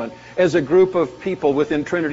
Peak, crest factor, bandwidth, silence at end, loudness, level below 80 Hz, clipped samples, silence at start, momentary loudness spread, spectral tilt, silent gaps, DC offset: -4 dBFS; 14 dB; 7.8 kHz; 0 s; -19 LUFS; -52 dBFS; under 0.1%; 0 s; 7 LU; -5.5 dB/octave; none; under 0.1%